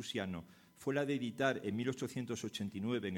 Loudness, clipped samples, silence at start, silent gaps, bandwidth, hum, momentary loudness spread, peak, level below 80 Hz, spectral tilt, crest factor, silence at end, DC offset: -39 LUFS; under 0.1%; 0 s; none; 17.5 kHz; none; 7 LU; -20 dBFS; -74 dBFS; -5.5 dB/octave; 20 dB; 0 s; under 0.1%